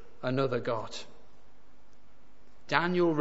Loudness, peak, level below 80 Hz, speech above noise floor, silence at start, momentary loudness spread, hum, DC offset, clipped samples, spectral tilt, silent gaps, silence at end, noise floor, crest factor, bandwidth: -30 LUFS; -8 dBFS; -66 dBFS; 34 dB; 0.25 s; 16 LU; none; 1%; under 0.1%; -6 dB/octave; none; 0 s; -63 dBFS; 26 dB; 8 kHz